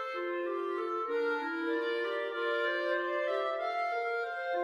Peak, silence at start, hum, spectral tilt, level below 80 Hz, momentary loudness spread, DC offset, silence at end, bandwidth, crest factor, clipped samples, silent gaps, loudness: -22 dBFS; 0 s; none; -2.5 dB/octave; -82 dBFS; 3 LU; under 0.1%; 0 s; 10.5 kHz; 12 dB; under 0.1%; none; -33 LUFS